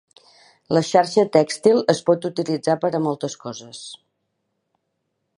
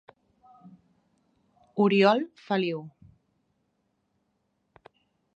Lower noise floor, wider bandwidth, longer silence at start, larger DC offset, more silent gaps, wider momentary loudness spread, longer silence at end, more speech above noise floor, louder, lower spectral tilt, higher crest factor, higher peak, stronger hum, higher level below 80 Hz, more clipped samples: about the same, -75 dBFS vs -75 dBFS; first, 11.5 kHz vs 7.8 kHz; about the same, 0.7 s vs 0.65 s; neither; neither; about the same, 17 LU vs 17 LU; second, 1.45 s vs 2.5 s; first, 55 dB vs 51 dB; first, -20 LUFS vs -25 LUFS; second, -5.5 dB/octave vs -7.5 dB/octave; about the same, 20 dB vs 24 dB; first, -2 dBFS vs -6 dBFS; neither; first, -70 dBFS vs -76 dBFS; neither